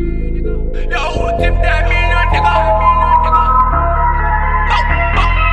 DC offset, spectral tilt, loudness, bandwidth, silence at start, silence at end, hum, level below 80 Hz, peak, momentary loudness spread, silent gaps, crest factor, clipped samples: under 0.1%; -6.5 dB/octave; -13 LUFS; 8.4 kHz; 0 s; 0 s; none; -16 dBFS; 0 dBFS; 10 LU; none; 10 dB; under 0.1%